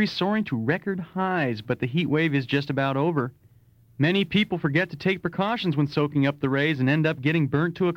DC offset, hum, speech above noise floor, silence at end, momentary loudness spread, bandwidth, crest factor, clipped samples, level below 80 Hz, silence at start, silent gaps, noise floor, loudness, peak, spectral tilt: under 0.1%; none; 33 dB; 0 s; 4 LU; 15.5 kHz; 14 dB; under 0.1%; -60 dBFS; 0 s; none; -56 dBFS; -24 LUFS; -10 dBFS; -8 dB/octave